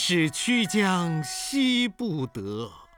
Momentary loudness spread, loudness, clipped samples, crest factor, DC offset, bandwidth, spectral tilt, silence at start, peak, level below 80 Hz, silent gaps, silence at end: 10 LU; -25 LUFS; under 0.1%; 16 dB; under 0.1%; 19.5 kHz; -4 dB/octave; 0 s; -10 dBFS; -60 dBFS; none; 0.15 s